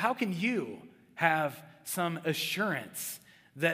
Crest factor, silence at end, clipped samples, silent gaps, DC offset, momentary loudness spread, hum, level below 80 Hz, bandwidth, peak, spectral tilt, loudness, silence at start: 22 dB; 0 s; under 0.1%; none; under 0.1%; 16 LU; none; -80 dBFS; 16 kHz; -10 dBFS; -4 dB/octave; -32 LUFS; 0 s